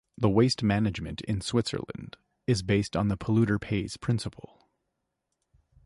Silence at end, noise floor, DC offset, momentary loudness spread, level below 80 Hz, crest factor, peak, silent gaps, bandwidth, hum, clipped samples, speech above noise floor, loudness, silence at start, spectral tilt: 1.55 s; -82 dBFS; under 0.1%; 13 LU; -50 dBFS; 20 dB; -10 dBFS; none; 11.5 kHz; none; under 0.1%; 54 dB; -28 LUFS; 0.2 s; -6 dB/octave